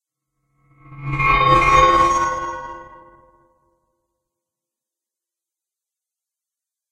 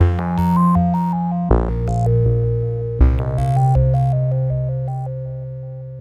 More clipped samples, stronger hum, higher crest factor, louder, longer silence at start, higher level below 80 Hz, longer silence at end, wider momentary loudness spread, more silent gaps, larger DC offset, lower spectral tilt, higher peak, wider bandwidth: neither; neither; about the same, 20 dB vs 16 dB; first, -15 LUFS vs -18 LUFS; first, 0.9 s vs 0 s; second, -36 dBFS vs -24 dBFS; first, 4.05 s vs 0 s; first, 21 LU vs 12 LU; neither; neither; second, -4.5 dB/octave vs -10 dB/octave; about the same, -2 dBFS vs 0 dBFS; first, 11.5 kHz vs 7.4 kHz